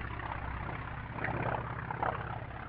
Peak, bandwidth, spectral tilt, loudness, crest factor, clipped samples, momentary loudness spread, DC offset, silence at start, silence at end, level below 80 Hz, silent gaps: -18 dBFS; 5 kHz; -5.5 dB/octave; -38 LUFS; 20 dB; under 0.1%; 6 LU; under 0.1%; 0 s; 0 s; -48 dBFS; none